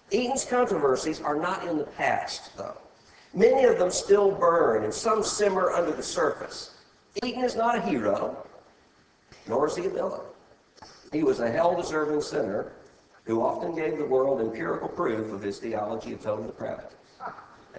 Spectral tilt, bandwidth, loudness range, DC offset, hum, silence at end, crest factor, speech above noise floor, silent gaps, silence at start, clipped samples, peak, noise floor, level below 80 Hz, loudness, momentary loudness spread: -4.5 dB/octave; 8 kHz; 7 LU; under 0.1%; none; 0 s; 18 dB; 35 dB; none; 0.1 s; under 0.1%; -8 dBFS; -61 dBFS; -60 dBFS; -26 LUFS; 17 LU